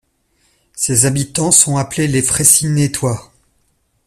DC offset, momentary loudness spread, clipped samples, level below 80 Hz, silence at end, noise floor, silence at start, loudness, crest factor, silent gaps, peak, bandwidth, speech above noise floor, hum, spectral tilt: under 0.1%; 11 LU; under 0.1%; -44 dBFS; 0.85 s; -61 dBFS; 0.75 s; -12 LUFS; 16 dB; none; 0 dBFS; over 20 kHz; 47 dB; none; -3.5 dB/octave